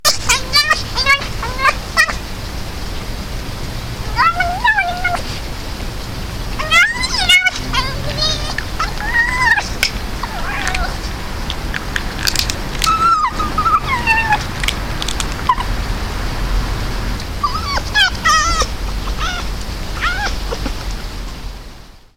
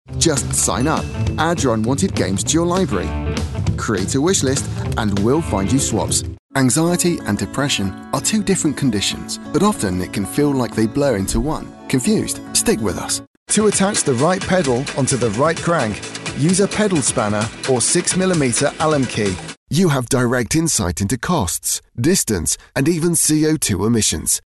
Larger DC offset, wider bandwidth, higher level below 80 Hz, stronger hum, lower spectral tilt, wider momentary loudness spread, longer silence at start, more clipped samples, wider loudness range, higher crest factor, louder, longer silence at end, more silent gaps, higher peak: neither; first, 17 kHz vs 12.5 kHz; first, -24 dBFS vs -36 dBFS; neither; second, -2.5 dB/octave vs -4 dB/octave; first, 14 LU vs 6 LU; about the same, 0 s vs 0.1 s; neither; first, 5 LU vs 2 LU; about the same, 16 dB vs 14 dB; about the same, -17 LUFS vs -18 LUFS; about the same, 0.1 s vs 0.05 s; second, none vs 6.39-6.49 s, 13.27-13.46 s, 19.57-19.66 s; first, 0 dBFS vs -4 dBFS